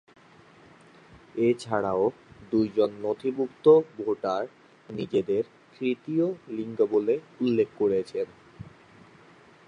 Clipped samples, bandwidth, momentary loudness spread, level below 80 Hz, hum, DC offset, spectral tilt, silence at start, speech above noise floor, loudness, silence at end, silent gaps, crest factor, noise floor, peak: under 0.1%; 10 kHz; 14 LU; -66 dBFS; none; under 0.1%; -7.5 dB/octave; 1.35 s; 29 dB; -27 LUFS; 1.05 s; none; 20 dB; -54 dBFS; -8 dBFS